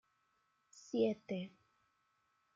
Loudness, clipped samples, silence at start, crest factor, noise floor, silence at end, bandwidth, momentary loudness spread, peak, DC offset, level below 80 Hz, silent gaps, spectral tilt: -39 LUFS; under 0.1%; 0.75 s; 20 dB; -80 dBFS; 1.1 s; 7.6 kHz; 17 LU; -22 dBFS; under 0.1%; -88 dBFS; none; -6.5 dB/octave